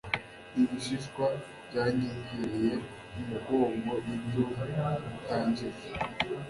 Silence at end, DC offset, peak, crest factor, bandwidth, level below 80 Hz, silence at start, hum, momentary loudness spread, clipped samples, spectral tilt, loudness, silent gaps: 0 s; under 0.1%; -12 dBFS; 22 dB; 11.5 kHz; -56 dBFS; 0.05 s; none; 8 LU; under 0.1%; -6.5 dB/octave; -33 LUFS; none